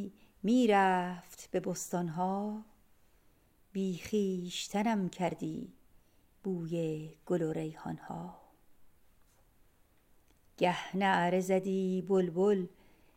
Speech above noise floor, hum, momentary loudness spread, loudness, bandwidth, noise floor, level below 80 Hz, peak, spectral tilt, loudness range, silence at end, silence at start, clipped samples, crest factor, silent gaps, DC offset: 34 dB; none; 15 LU; -33 LUFS; 16 kHz; -66 dBFS; -68 dBFS; -14 dBFS; -6 dB/octave; 9 LU; 0.45 s; 0 s; under 0.1%; 20 dB; none; under 0.1%